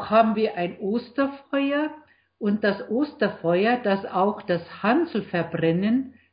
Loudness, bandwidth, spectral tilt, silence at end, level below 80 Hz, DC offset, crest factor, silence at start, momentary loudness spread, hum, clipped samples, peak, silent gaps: -24 LUFS; 5.2 kHz; -11 dB/octave; 0.2 s; -62 dBFS; under 0.1%; 18 dB; 0 s; 6 LU; none; under 0.1%; -6 dBFS; none